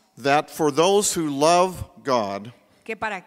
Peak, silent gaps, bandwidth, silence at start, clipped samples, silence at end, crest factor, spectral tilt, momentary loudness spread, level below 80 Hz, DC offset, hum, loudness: -2 dBFS; none; 16 kHz; 0.2 s; under 0.1%; 0.05 s; 20 dB; -3.5 dB/octave; 13 LU; -52 dBFS; under 0.1%; none; -21 LUFS